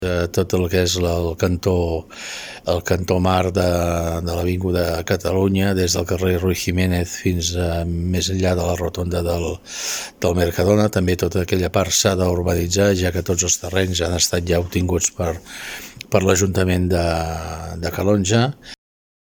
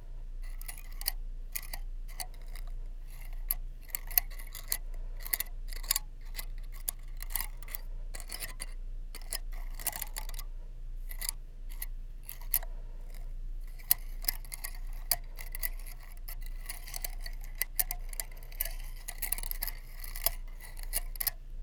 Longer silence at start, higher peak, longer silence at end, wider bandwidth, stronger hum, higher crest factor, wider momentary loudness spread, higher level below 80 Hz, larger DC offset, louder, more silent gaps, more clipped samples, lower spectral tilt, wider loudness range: about the same, 0 s vs 0 s; first, 0 dBFS vs -4 dBFS; first, 0.65 s vs 0 s; second, 18 kHz vs over 20 kHz; neither; second, 20 dB vs 32 dB; second, 9 LU vs 15 LU; about the same, -36 dBFS vs -40 dBFS; neither; first, -20 LUFS vs -37 LUFS; neither; neither; first, -4.5 dB/octave vs -0.5 dB/octave; second, 3 LU vs 6 LU